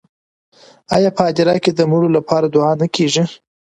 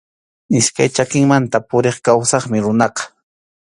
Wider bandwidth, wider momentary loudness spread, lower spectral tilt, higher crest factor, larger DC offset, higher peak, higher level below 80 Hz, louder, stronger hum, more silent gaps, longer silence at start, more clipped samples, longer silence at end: about the same, 11 kHz vs 11.5 kHz; about the same, 3 LU vs 5 LU; about the same, -5.5 dB/octave vs -4.5 dB/octave; about the same, 16 dB vs 16 dB; neither; about the same, 0 dBFS vs 0 dBFS; about the same, -56 dBFS vs -54 dBFS; about the same, -15 LUFS vs -15 LUFS; neither; neither; first, 0.9 s vs 0.5 s; neither; second, 0.3 s vs 0.7 s